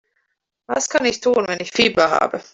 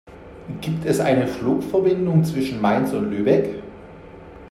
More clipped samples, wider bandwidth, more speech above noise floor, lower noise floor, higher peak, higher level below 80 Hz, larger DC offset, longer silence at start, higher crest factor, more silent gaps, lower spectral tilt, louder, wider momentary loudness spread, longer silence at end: neither; second, 8 kHz vs 14.5 kHz; first, 54 dB vs 21 dB; first, -72 dBFS vs -41 dBFS; about the same, -2 dBFS vs -4 dBFS; second, -56 dBFS vs -50 dBFS; neither; first, 0.7 s vs 0.05 s; about the same, 18 dB vs 18 dB; neither; second, -2.5 dB/octave vs -7.5 dB/octave; first, -18 LUFS vs -21 LUFS; second, 7 LU vs 22 LU; about the same, 0.1 s vs 0 s